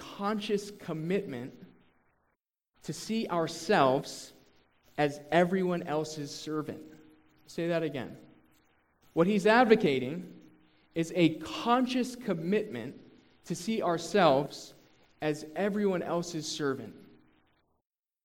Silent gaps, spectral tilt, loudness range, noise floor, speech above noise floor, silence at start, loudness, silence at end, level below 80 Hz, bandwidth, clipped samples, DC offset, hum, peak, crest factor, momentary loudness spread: none; -5.5 dB/octave; 7 LU; -80 dBFS; 50 dB; 0 s; -30 LUFS; 1.2 s; -68 dBFS; 16.5 kHz; under 0.1%; under 0.1%; none; -8 dBFS; 24 dB; 17 LU